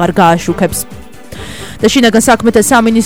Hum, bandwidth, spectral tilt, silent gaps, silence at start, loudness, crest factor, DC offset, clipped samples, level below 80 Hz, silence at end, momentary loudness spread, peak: none; 17.5 kHz; -4 dB/octave; none; 0 s; -9 LUFS; 10 dB; 2%; 0.5%; -34 dBFS; 0 s; 18 LU; 0 dBFS